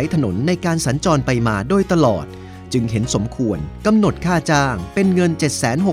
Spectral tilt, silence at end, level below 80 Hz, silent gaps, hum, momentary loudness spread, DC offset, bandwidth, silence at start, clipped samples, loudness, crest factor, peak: -6 dB/octave; 0 s; -38 dBFS; none; none; 6 LU; under 0.1%; 15.5 kHz; 0 s; under 0.1%; -18 LUFS; 16 dB; -2 dBFS